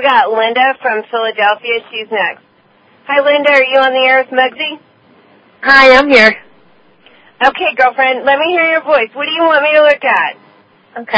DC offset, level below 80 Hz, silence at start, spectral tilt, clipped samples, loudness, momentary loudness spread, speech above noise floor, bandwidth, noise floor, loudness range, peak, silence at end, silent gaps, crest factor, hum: under 0.1%; -52 dBFS; 0 s; -3.5 dB/octave; 0.4%; -10 LUFS; 12 LU; 38 dB; 8 kHz; -49 dBFS; 4 LU; 0 dBFS; 0 s; none; 12 dB; none